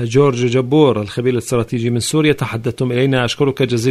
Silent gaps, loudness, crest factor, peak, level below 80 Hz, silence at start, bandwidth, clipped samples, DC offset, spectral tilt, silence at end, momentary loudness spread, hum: none; -16 LUFS; 14 dB; 0 dBFS; -48 dBFS; 0 s; 14 kHz; under 0.1%; under 0.1%; -6 dB/octave; 0 s; 6 LU; none